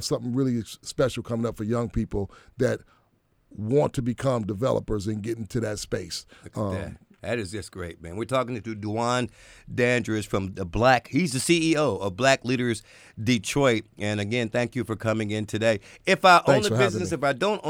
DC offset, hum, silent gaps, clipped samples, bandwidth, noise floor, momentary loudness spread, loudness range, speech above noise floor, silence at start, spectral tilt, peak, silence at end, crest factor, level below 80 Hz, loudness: under 0.1%; none; none; under 0.1%; 16.5 kHz; -66 dBFS; 13 LU; 8 LU; 41 dB; 0 s; -5 dB/octave; -6 dBFS; 0 s; 20 dB; -48 dBFS; -25 LUFS